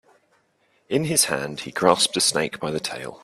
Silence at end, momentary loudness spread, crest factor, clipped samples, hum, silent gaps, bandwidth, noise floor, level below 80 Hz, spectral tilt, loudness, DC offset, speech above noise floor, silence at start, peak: 0.1 s; 10 LU; 24 dB; under 0.1%; none; none; 15 kHz; -65 dBFS; -60 dBFS; -2.5 dB/octave; -21 LUFS; under 0.1%; 42 dB; 0.9 s; 0 dBFS